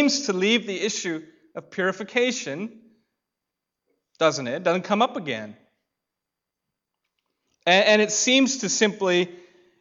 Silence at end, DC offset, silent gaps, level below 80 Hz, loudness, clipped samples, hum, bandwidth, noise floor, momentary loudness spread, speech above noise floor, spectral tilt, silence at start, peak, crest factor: 0.45 s; under 0.1%; none; -78 dBFS; -22 LUFS; under 0.1%; none; 8 kHz; -85 dBFS; 16 LU; 62 dB; -3 dB/octave; 0 s; -6 dBFS; 20 dB